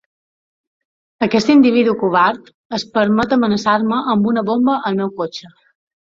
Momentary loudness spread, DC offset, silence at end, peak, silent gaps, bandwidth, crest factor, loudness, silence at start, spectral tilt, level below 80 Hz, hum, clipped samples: 14 LU; under 0.1%; 0.65 s; 0 dBFS; 2.54-2.70 s; 7.6 kHz; 16 dB; -16 LUFS; 1.2 s; -6 dB/octave; -54 dBFS; none; under 0.1%